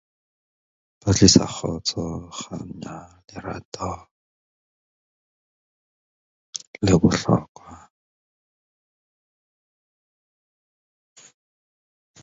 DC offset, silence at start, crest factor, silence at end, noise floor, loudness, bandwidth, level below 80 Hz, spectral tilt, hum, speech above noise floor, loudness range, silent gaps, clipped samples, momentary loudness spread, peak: under 0.1%; 1.05 s; 26 dB; 4.45 s; under -90 dBFS; -21 LUFS; 7.8 kHz; -44 dBFS; -4.5 dB/octave; none; over 68 dB; 16 LU; 3.65-3.72 s, 4.11-6.53 s, 6.67-6.74 s, 7.49-7.55 s; under 0.1%; 22 LU; 0 dBFS